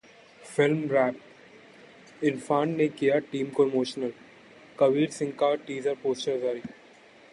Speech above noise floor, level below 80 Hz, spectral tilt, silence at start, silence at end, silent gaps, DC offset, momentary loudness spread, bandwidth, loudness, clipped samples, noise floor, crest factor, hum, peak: 28 dB; -74 dBFS; -6 dB/octave; 0.4 s; 0.6 s; none; under 0.1%; 9 LU; 11.5 kHz; -27 LUFS; under 0.1%; -54 dBFS; 18 dB; none; -10 dBFS